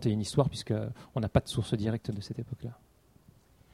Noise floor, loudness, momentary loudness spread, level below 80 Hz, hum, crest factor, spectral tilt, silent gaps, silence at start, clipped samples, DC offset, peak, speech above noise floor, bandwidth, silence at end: -61 dBFS; -32 LUFS; 11 LU; -52 dBFS; none; 24 dB; -6.5 dB/octave; none; 0 s; under 0.1%; under 0.1%; -8 dBFS; 30 dB; 13 kHz; 1 s